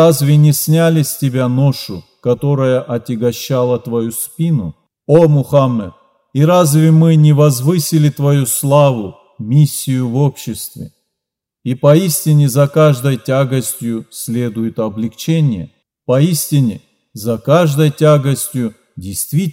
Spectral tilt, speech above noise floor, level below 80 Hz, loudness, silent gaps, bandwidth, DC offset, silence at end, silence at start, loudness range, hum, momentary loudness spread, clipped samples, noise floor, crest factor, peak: -6.5 dB/octave; 68 dB; -56 dBFS; -13 LUFS; none; 16.5 kHz; under 0.1%; 0 s; 0 s; 5 LU; none; 14 LU; under 0.1%; -80 dBFS; 12 dB; 0 dBFS